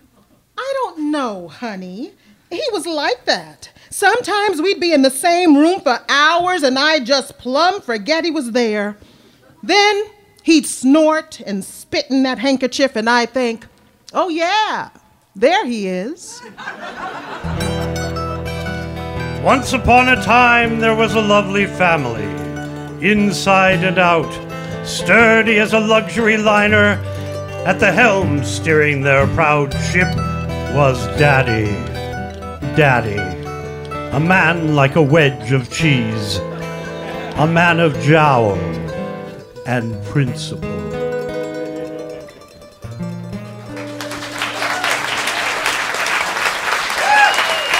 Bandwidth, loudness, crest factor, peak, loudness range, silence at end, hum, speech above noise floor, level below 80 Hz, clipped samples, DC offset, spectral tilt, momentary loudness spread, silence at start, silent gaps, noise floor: 16 kHz; -15 LUFS; 16 dB; 0 dBFS; 9 LU; 0 s; none; 39 dB; -40 dBFS; under 0.1%; under 0.1%; -5 dB/octave; 16 LU; 0.55 s; none; -54 dBFS